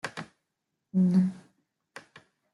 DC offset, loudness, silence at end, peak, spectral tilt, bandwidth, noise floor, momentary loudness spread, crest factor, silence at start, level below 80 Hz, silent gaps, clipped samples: under 0.1%; -27 LUFS; 0.55 s; -14 dBFS; -8 dB/octave; 11.5 kHz; -83 dBFS; 26 LU; 16 dB; 0.05 s; -74 dBFS; none; under 0.1%